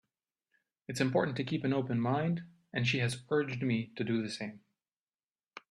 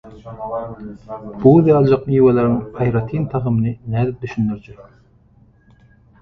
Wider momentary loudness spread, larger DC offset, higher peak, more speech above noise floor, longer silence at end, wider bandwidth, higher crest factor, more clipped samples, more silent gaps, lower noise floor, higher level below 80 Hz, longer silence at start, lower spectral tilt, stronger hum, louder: second, 12 LU vs 20 LU; neither; second, -16 dBFS vs 0 dBFS; first, over 57 dB vs 35 dB; second, 0.1 s vs 1.4 s; first, 12.5 kHz vs 6.2 kHz; about the same, 20 dB vs 18 dB; neither; first, 4.93-5.07 s, 5.23-5.35 s vs none; first, under -90 dBFS vs -52 dBFS; second, -70 dBFS vs -44 dBFS; first, 0.9 s vs 0.05 s; second, -6 dB/octave vs -11 dB/octave; neither; second, -33 LUFS vs -17 LUFS